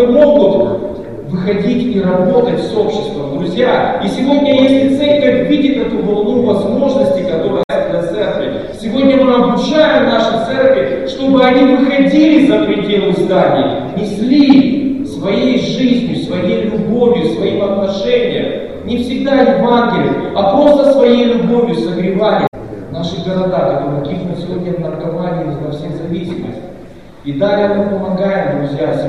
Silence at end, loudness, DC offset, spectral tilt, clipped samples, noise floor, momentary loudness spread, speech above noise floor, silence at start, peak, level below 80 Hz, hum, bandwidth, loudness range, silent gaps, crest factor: 0 s; -12 LUFS; 0.8%; -7 dB/octave; under 0.1%; -34 dBFS; 11 LU; 23 dB; 0 s; 0 dBFS; -42 dBFS; none; 11 kHz; 7 LU; 7.64-7.69 s, 22.48-22.52 s; 12 dB